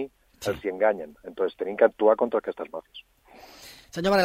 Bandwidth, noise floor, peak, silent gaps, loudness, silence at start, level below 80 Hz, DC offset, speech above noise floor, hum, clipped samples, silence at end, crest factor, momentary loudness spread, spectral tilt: 16 kHz; -48 dBFS; -6 dBFS; none; -26 LUFS; 0 s; -58 dBFS; under 0.1%; 23 dB; none; under 0.1%; 0 s; 20 dB; 24 LU; -5 dB/octave